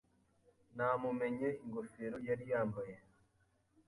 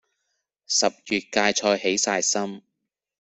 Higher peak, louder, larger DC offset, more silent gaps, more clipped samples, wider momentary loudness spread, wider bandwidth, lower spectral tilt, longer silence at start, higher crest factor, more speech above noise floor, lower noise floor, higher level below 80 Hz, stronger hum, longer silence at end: second, -24 dBFS vs -4 dBFS; second, -40 LUFS vs -22 LUFS; neither; neither; neither; first, 12 LU vs 6 LU; first, 11.5 kHz vs 8.4 kHz; first, -8.5 dB/octave vs -1.5 dB/octave; about the same, 0.75 s vs 0.7 s; about the same, 18 dB vs 22 dB; second, 37 dB vs 58 dB; second, -76 dBFS vs -81 dBFS; second, -74 dBFS vs -66 dBFS; neither; first, 0.9 s vs 0.75 s